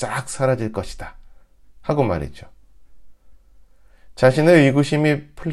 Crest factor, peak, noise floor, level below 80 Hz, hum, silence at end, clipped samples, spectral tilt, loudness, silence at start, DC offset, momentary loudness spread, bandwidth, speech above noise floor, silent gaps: 20 dB; 0 dBFS; -47 dBFS; -44 dBFS; none; 0 s; under 0.1%; -6.5 dB/octave; -18 LUFS; 0 s; under 0.1%; 21 LU; 13 kHz; 29 dB; none